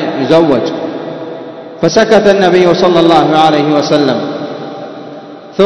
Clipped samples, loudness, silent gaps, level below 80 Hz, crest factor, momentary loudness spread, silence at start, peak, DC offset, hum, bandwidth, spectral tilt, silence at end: 2%; -9 LUFS; none; -48 dBFS; 10 dB; 18 LU; 0 s; 0 dBFS; under 0.1%; none; 11 kHz; -5.5 dB/octave; 0 s